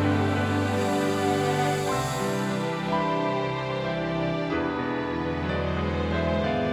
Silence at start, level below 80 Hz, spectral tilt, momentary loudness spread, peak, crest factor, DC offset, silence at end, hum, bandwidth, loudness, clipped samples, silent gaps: 0 s; -44 dBFS; -6 dB/octave; 4 LU; -12 dBFS; 14 dB; under 0.1%; 0 s; none; 19.5 kHz; -26 LUFS; under 0.1%; none